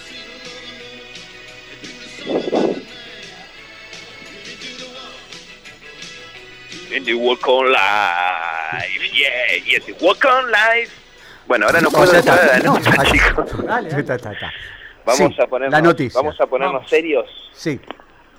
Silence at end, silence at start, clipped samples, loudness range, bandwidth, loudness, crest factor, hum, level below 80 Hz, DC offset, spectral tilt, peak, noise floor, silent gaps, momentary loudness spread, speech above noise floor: 0.6 s; 0 s; under 0.1%; 15 LU; 16.5 kHz; -15 LUFS; 14 dB; none; -38 dBFS; under 0.1%; -4 dB/octave; -4 dBFS; -43 dBFS; none; 23 LU; 27 dB